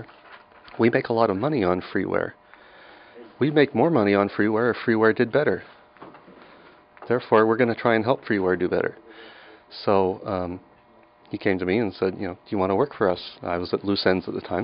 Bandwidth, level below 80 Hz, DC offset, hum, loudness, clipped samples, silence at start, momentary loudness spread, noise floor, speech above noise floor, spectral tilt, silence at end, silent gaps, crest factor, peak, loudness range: 5.6 kHz; -62 dBFS; under 0.1%; none; -23 LUFS; under 0.1%; 0 s; 11 LU; -55 dBFS; 32 dB; -5 dB/octave; 0 s; none; 20 dB; -4 dBFS; 5 LU